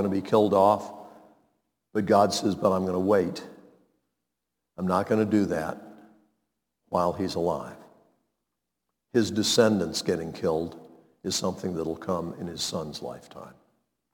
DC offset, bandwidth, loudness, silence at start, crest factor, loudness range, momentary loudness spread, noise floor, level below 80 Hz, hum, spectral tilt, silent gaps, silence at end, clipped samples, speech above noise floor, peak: under 0.1%; 19 kHz; -26 LUFS; 0 s; 22 dB; 7 LU; 17 LU; -84 dBFS; -62 dBFS; none; -5 dB/octave; none; 0.65 s; under 0.1%; 58 dB; -6 dBFS